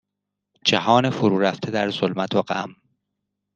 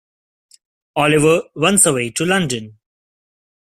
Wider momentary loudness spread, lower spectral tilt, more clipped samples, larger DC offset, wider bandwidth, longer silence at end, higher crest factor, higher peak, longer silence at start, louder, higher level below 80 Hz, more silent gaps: about the same, 9 LU vs 11 LU; first, -5 dB/octave vs -3.5 dB/octave; neither; neither; second, 9.4 kHz vs 15.5 kHz; about the same, 0.85 s vs 0.95 s; about the same, 22 dB vs 18 dB; about the same, -2 dBFS vs 0 dBFS; second, 0.65 s vs 0.95 s; second, -21 LUFS vs -15 LUFS; second, -66 dBFS vs -52 dBFS; neither